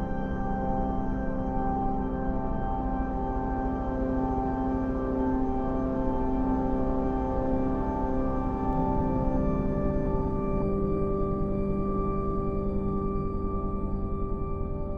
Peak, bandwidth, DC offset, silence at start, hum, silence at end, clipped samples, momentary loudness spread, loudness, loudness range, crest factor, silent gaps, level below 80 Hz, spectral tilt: -12 dBFS; 4.9 kHz; under 0.1%; 0 s; none; 0 s; under 0.1%; 4 LU; -30 LUFS; 2 LU; 14 dB; none; -32 dBFS; -10.5 dB/octave